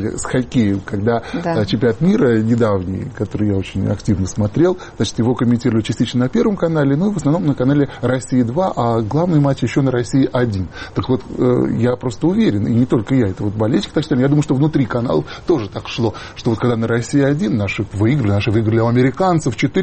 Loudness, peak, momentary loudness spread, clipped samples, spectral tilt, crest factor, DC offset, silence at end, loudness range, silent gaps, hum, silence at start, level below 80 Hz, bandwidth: -17 LUFS; -4 dBFS; 5 LU; under 0.1%; -7 dB/octave; 12 dB; under 0.1%; 0 s; 1 LU; none; none; 0 s; -40 dBFS; 8.8 kHz